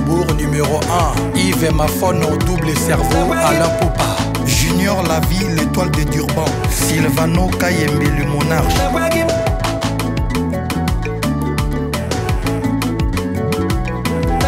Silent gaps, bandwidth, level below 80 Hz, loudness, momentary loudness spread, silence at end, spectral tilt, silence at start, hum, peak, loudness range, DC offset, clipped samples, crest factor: none; 16.5 kHz; -24 dBFS; -16 LUFS; 5 LU; 0 s; -5 dB/octave; 0 s; none; -4 dBFS; 4 LU; under 0.1%; under 0.1%; 12 dB